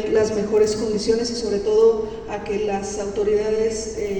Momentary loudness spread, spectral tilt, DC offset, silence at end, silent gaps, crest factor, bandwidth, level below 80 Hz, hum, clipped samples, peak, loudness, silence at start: 9 LU; -4.5 dB/octave; under 0.1%; 0 s; none; 14 dB; 9.4 kHz; -44 dBFS; none; under 0.1%; -6 dBFS; -21 LUFS; 0 s